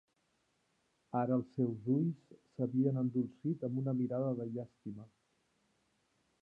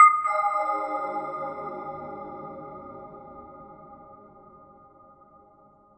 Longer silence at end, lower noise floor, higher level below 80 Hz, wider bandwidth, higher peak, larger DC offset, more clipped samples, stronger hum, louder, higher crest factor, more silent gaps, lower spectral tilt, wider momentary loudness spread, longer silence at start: second, 1.35 s vs 1.5 s; first, -79 dBFS vs -57 dBFS; second, -80 dBFS vs -68 dBFS; second, 2.8 kHz vs 8.4 kHz; second, -20 dBFS vs -4 dBFS; neither; neither; neither; second, -36 LUFS vs -27 LUFS; second, 18 dB vs 24 dB; neither; first, -11.5 dB/octave vs -5 dB/octave; second, 16 LU vs 23 LU; first, 1.15 s vs 0 s